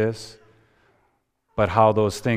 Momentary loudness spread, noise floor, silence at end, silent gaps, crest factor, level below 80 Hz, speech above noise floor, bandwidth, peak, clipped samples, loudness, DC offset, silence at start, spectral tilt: 19 LU; -69 dBFS; 0 s; none; 20 dB; -50 dBFS; 48 dB; 15.5 kHz; -2 dBFS; under 0.1%; -20 LUFS; under 0.1%; 0 s; -6.5 dB/octave